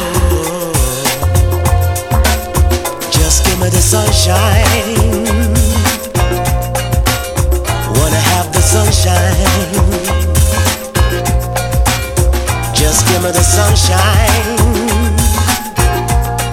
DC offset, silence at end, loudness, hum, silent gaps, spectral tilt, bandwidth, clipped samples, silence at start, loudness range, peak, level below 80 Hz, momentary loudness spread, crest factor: under 0.1%; 0 s; -12 LUFS; none; none; -4 dB/octave; 17.5 kHz; under 0.1%; 0 s; 2 LU; 0 dBFS; -16 dBFS; 5 LU; 12 dB